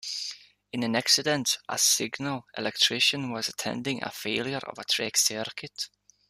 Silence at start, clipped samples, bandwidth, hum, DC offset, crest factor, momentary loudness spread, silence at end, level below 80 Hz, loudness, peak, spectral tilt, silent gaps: 0.05 s; under 0.1%; 15 kHz; 50 Hz at -65 dBFS; under 0.1%; 22 dB; 14 LU; 0.45 s; -70 dBFS; -26 LUFS; -6 dBFS; -1.5 dB/octave; none